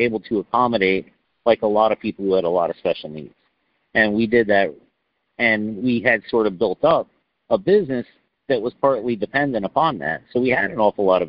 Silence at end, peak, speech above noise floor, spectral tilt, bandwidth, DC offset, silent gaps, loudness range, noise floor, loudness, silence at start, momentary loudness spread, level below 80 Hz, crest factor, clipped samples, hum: 0 s; -2 dBFS; 51 dB; -3.5 dB/octave; 5.4 kHz; under 0.1%; none; 2 LU; -70 dBFS; -20 LUFS; 0 s; 7 LU; -56 dBFS; 18 dB; under 0.1%; none